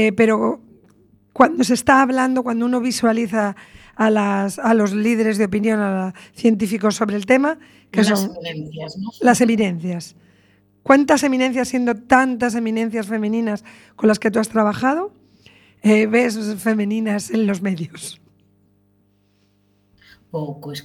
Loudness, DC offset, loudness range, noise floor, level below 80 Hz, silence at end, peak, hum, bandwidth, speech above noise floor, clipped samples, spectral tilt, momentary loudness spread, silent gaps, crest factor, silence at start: -18 LUFS; under 0.1%; 4 LU; -61 dBFS; -58 dBFS; 0.05 s; 0 dBFS; 50 Hz at -45 dBFS; 19 kHz; 43 dB; under 0.1%; -5 dB/octave; 15 LU; none; 18 dB; 0 s